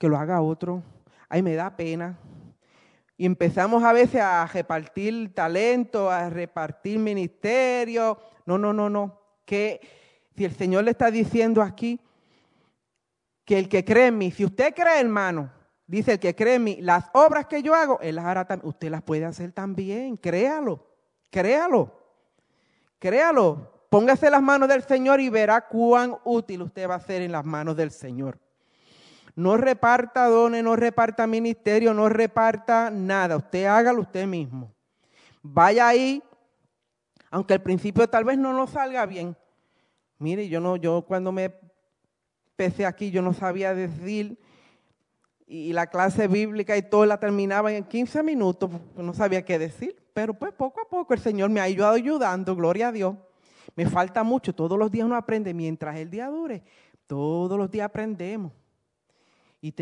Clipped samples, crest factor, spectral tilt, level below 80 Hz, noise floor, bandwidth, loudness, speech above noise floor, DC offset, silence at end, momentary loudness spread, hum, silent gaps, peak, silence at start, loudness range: under 0.1%; 20 dB; -6.5 dB/octave; -66 dBFS; -80 dBFS; 10.5 kHz; -23 LUFS; 57 dB; under 0.1%; 0 s; 13 LU; none; none; -4 dBFS; 0 s; 8 LU